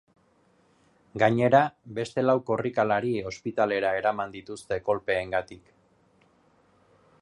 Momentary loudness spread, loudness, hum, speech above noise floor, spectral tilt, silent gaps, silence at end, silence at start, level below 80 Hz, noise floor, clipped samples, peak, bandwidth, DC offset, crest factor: 12 LU; -26 LUFS; none; 38 dB; -6.5 dB/octave; none; 1.65 s; 1.15 s; -60 dBFS; -64 dBFS; under 0.1%; -6 dBFS; 11.5 kHz; under 0.1%; 22 dB